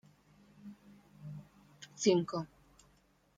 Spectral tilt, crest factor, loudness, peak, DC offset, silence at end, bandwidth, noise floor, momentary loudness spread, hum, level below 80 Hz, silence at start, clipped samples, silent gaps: -5 dB/octave; 24 dB; -33 LUFS; -16 dBFS; under 0.1%; 0.9 s; 9.6 kHz; -69 dBFS; 25 LU; none; -74 dBFS; 0.65 s; under 0.1%; none